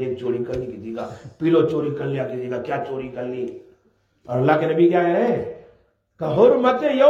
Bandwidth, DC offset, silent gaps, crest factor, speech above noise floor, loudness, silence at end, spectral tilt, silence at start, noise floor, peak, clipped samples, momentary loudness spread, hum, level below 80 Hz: 7.4 kHz; under 0.1%; none; 18 dB; 43 dB; -21 LUFS; 0 s; -8.5 dB/octave; 0 s; -63 dBFS; -2 dBFS; under 0.1%; 14 LU; none; -58 dBFS